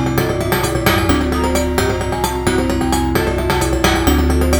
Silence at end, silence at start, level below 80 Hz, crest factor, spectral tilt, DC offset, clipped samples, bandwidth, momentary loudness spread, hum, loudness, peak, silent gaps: 0 s; 0 s; -22 dBFS; 16 dB; -5 dB/octave; 0.1%; under 0.1%; over 20 kHz; 3 LU; none; -16 LUFS; 0 dBFS; none